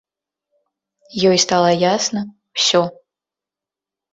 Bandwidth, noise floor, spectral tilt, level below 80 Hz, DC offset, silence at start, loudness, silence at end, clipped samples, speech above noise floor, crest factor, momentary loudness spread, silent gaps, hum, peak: 8 kHz; -88 dBFS; -3.5 dB/octave; -60 dBFS; under 0.1%; 1.15 s; -16 LUFS; 1.2 s; under 0.1%; 72 dB; 18 dB; 13 LU; none; none; -2 dBFS